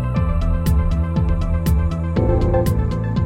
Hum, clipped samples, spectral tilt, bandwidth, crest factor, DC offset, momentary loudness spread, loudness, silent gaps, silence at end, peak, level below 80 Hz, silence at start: none; under 0.1%; -8 dB/octave; 16 kHz; 14 dB; under 0.1%; 3 LU; -19 LUFS; none; 0 s; -4 dBFS; -20 dBFS; 0 s